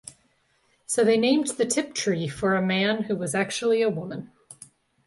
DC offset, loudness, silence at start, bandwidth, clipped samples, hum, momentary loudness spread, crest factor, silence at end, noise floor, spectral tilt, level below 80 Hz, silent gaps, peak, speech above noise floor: under 0.1%; -24 LUFS; 0.05 s; 11.5 kHz; under 0.1%; none; 9 LU; 16 dB; 0.55 s; -67 dBFS; -4 dB/octave; -64 dBFS; none; -10 dBFS; 43 dB